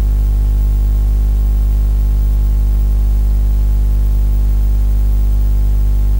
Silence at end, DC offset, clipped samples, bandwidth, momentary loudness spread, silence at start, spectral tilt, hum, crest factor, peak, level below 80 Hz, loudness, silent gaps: 0 s; under 0.1%; under 0.1%; 16 kHz; 0 LU; 0 s; -8 dB/octave; 50 Hz at -10 dBFS; 6 dB; -6 dBFS; -12 dBFS; -16 LUFS; none